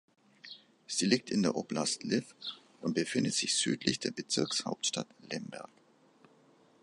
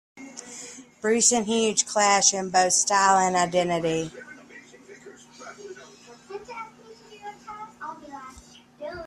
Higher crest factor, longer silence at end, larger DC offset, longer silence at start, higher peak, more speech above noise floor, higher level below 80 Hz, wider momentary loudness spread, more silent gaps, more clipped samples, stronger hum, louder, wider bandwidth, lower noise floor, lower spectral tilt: about the same, 24 dB vs 24 dB; first, 1.15 s vs 0 s; neither; first, 0.45 s vs 0.15 s; second, -12 dBFS vs -4 dBFS; about the same, 31 dB vs 28 dB; second, -74 dBFS vs -64 dBFS; second, 20 LU vs 24 LU; neither; neither; second, none vs 60 Hz at -55 dBFS; second, -33 LUFS vs -21 LUFS; second, 11.5 kHz vs 14 kHz; first, -64 dBFS vs -50 dBFS; about the same, -3 dB/octave vs -2 dB/octave